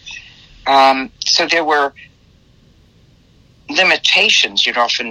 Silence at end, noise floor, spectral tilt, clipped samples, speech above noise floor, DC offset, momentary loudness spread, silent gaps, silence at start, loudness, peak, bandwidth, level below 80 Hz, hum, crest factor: 0 s; -50 dBFS; -0.5 dB/octave; under 0.1%; 36 dB; under 0.1%; 11 LU; none; 0.05 s; -13 LUFS; 0 dBFS; 16 kHz; -54 dBFS; none; 16 dB